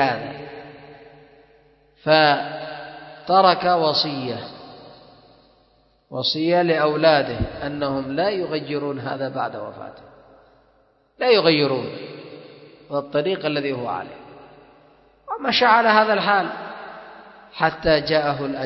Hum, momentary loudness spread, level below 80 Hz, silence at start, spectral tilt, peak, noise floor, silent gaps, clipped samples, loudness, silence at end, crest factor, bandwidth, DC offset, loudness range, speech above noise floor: none; 22 LU; -50 dBFS; 0 s; -6.5 dB/octave; 0 dBFS; -60 dBFS; none; under 0.1%; -20 LUFS; 0 s; 22 dB; 6 kHz; under 0.1%; 7 LU; 40 dB